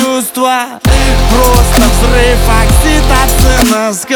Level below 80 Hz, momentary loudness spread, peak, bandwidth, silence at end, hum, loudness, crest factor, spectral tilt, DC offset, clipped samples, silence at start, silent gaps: -10 dBFS; 4 LU; 0 dBFS; over 20 kHz; 0 s; none; -9 LUFS; 8 dB; -4.5 dB/octave; under 0.1%; 0.6%; 0 s; none